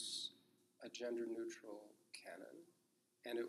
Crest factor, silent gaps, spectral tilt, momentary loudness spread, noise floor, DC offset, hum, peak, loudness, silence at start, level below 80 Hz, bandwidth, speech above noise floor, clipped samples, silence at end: 16 dB; none; -2 dB/octave; 14 LU; -73 dBFS; under 0.1%; none; -34 dBFS; -50 LUFS; 0 s; under -90 dBFS; 14 kHz; 24 dB; under 0.1%; 0 s